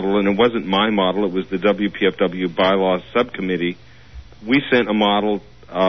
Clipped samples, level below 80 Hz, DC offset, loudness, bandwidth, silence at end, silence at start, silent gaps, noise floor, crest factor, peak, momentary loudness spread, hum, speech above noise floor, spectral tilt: under 0.1%; -48 dBFS; 0.5%; -19 LUFS; 6.2 kHz; 0 s; 0 s; none; -40 dBFS; 14 dB; -4 dBFS; 7 LU; none; 22 dB; -7.5 dB/octave